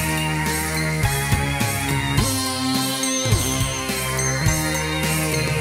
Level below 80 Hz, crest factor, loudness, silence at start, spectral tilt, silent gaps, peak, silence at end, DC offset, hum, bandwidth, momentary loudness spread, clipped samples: -34 dBFS; 16 dB; -21 LUFS; 0 s; -3.5 dB/octave; none; -4 dBFS; 0 s; under 0.1%; none; 16.5 kHz; 2 LU; under 0.1%